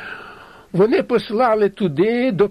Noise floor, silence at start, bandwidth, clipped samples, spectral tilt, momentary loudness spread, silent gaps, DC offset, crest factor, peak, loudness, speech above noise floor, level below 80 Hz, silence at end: -41 dBFS; 0 s; 10.5 kHz; under 0.1%; -8 dB/octave; 11 LU; none; under 0.1%; 14 dB; -4 dBFS; -18 LUFS; 24 dB; -54 dBFS; 0 s